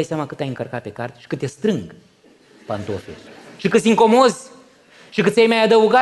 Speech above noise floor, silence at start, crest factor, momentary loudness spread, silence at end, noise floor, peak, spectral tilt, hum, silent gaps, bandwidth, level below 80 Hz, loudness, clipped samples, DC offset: 33 dB; 0 s; 16 dB; 18 LU; 0 s; -51 dBFS; -2 dBFS; -5 dB/octave; none; none; 12 kHz; -60 dBFS; -18 LUFS; under 0.1%; under 0.1%